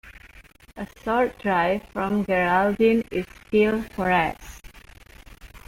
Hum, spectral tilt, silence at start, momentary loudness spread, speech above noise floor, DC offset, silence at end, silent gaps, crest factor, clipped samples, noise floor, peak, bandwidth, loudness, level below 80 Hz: none; -6.5 dB/octave; 0.05 s; 14 LU; 27 dB; under 0.1%; 0.1 s; none; 16 dB; under 0.1%; -50 dBFS; -8 dBFS; 16.5 kHz; -23 LUFS; -48 dBFS